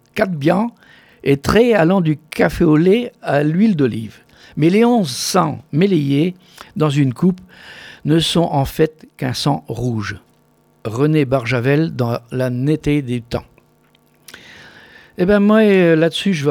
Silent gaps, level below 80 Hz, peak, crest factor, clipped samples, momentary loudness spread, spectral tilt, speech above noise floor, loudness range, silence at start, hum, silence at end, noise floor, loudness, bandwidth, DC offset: none; -42 dBFS; 0 dBFS; 16 dB; under 0.1%; 14 LU; -6.5 dB/octave; 40 dB; 4 LU; 0.15 s; none; 0 s; -55 dBFS; -16 LUFS; 18.5 kHz; under 0.1%